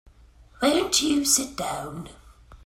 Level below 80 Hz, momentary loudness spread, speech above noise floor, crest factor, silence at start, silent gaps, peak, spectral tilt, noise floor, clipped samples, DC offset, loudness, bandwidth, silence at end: -52 dBFS; 18 LU; 28 dB; 20 dB; 0.6 s; none; -6 dBFS; -2 dB/octave; -52 dBFS; under 0.1%; under 0.1%; -23 LUFS; 16 kHz; 0.1 s